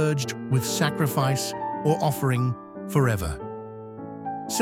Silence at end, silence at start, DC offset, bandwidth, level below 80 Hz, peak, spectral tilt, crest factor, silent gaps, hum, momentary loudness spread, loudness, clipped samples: 0 s; 0 s; under 0.1%; 17 kHz; -46 dBFS; -8 dBFS; -5.5 dB/octave; 18 dB; none; none; 13 LU; -26 LUFS; under 0.1%